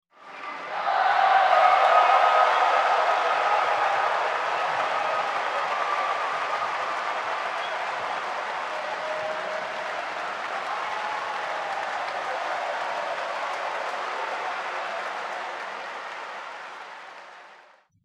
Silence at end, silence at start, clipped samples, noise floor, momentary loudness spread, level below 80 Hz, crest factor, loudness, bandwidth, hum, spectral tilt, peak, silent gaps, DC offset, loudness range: 0.45 s; 0.2 s; under 0.1%; -55 dBFS; 16 LU; -82 dBFS; 20 dB; -25 LUFS; 11.5 kHz; none; -1.5 dB/octave; -6 dBFS; none; under 0.1%; 11 LU